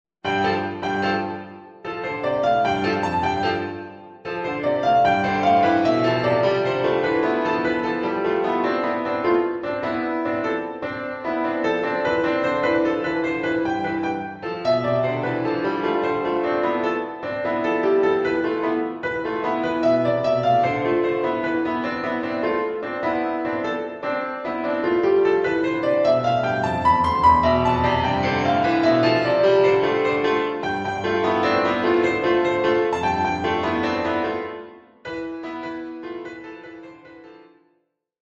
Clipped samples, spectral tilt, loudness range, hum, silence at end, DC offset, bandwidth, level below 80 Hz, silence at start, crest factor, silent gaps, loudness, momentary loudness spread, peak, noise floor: under 0.1%; -6.5 dB/octave; 5 LU; none; 0.8 s; under 0.1%; 8 kHz; -50 dBFS; 0.25 s; 16 dB; none; -21 LUFS; 11 LU; -4 dBFS; -69 dBFS